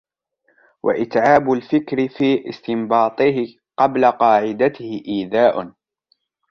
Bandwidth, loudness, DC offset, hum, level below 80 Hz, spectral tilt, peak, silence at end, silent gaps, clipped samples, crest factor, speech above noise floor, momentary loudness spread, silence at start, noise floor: 6.8 kHz; -18 LUFS; under 0.1%; none; -60 dBFS; -7 dB/octave; -2 dBFS; 0.8 s; none; under 0.1%; 18 dB; 49 dB; 10 LU; 0.85 s; -66 dBFS